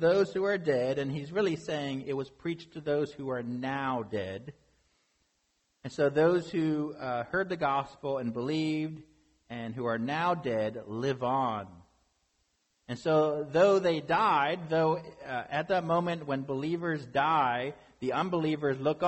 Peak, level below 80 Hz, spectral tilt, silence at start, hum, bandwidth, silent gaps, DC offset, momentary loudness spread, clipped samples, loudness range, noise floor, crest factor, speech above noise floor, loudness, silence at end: -14 dBFS; -66 dBFS; -6.5 dB/octave; 0 s; none; 8.4 kHz; none; under 0.1%; 12 LU; under 0.1%; 6 LU; -76 dBFS; 18 dB; 46 dB; -30 LUFS; 0 s